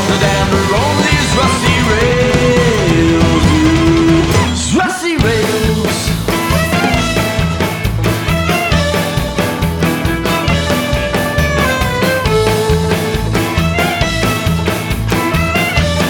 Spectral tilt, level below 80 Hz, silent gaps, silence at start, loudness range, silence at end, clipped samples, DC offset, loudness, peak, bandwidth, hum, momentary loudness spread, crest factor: -5 dB/octave; -24 dBFS; none; 0 s; 3 LU; 0 s; under 0.1%; under 0.1%; -13 LUFS; 0 dBFS; 19 kHz; none; 5 LU; 12 dB